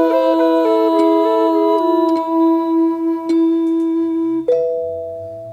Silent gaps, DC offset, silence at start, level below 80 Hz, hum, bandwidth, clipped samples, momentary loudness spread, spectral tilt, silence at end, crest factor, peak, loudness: none; under 0.1%; 0 s; -62 dBFS; none; 5.2 kHz; under 0.1%; 7 LU; -6.5 dB/octave; 0 s; 12 dB; -4 dBFS; -15 LUFS